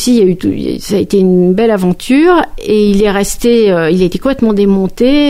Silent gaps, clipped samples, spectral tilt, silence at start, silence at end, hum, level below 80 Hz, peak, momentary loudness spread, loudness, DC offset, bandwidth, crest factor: none; under 0.1%; -6 dB/octave; 0 s; 0 s; none; -30 dBFS; 0 dBFS; 5 LU; -10 LUFS; under 0.1%; 16 kHz; 10 dB